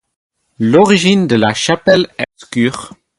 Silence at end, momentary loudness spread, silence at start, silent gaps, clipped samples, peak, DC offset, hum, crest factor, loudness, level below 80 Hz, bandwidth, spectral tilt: 0.3 s; 11 LU; 0.6 s; none; under 0.1%; 0 dBFS; under 0.1%; none; 14 dB; -12 LUFS; -52 dBFS; 11.5 kHz; -5 dB/octave